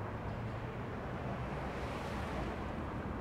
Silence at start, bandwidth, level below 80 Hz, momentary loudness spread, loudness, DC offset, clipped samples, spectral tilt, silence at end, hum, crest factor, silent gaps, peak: 0 s; 15.5 kHz; -50 dBFS; 2 LU; -41 LUFS; under 0.1%; under 0.1%; -7 dB/octave; 0 s; none; 14 dB; none; -28 dBFS